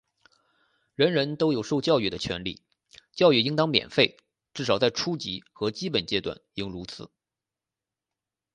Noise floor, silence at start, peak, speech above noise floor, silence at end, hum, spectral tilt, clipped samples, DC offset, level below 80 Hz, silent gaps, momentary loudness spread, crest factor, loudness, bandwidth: -89 dBFS; 1 s; -4 dBFS; 64 dB; 1.5 s; none; -5 dB/octave; under 0.1%; under 0.1%; -58 dBFS; none; 16 LU; 24 dB; -26 LUFS; 10 kHz